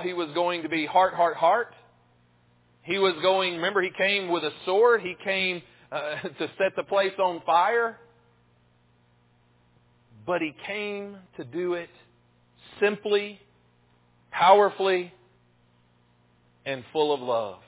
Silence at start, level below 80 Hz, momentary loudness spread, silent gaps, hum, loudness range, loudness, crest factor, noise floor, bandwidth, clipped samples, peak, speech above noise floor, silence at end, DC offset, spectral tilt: 0 s; -72 dBFS; 15 LU; none; 60 Hz at -65 dBFS; 9 LU; -25 LUFS; 22 dB; -63 dBFS; 4 kHz; under 0.1%; -4 dBFS; 38 dB; 0.15 s; under 0.1%; -8 dB/octave